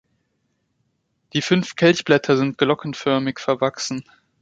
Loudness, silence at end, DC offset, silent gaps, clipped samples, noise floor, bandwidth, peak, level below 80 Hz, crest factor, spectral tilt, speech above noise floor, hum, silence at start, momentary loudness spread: -20 LUFS; 0.4 s; under 0.1%; none; under 0.1%; -71 dBFS; 9.2 kHz; -2 dBFS; -62 dBFS; 20 dB; -5 dB/octave; 51 dB; none; 1.35 s; 10 LU